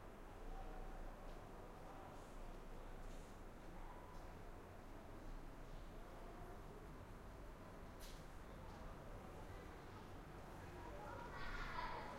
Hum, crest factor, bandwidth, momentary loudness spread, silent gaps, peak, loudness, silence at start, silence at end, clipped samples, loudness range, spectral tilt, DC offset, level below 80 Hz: none; 18 dB; 16 kHz; 7 LU; none; -36 dBFS; -56 LUFS; 0 s; 0 s; under 0.1%; 3 LU; -5.5 dB/octave; under 0.1%; -56 dBFS